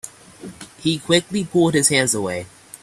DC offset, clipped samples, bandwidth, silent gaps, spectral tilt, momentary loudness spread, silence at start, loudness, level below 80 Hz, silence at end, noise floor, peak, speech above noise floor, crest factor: under 0.1%; under 0.1%; 15 kHz; none; -3.5 dB/octave; 22 LU; 0.05 s; -18 LUFS; -56 dBFS; 0.05 s; -39 dBFS; 0 dBFS; 21 dB; 20 dB